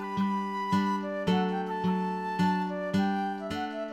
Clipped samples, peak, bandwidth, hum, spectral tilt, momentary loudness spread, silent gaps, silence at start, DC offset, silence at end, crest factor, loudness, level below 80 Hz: under 0.1%; -14 dBFS; 11.5 kHz; none; -7 dB/octave; 5 LU; none; 0 s; under 0.1%; 0 s; 14 dB; -30 LUFS; -64 dBFS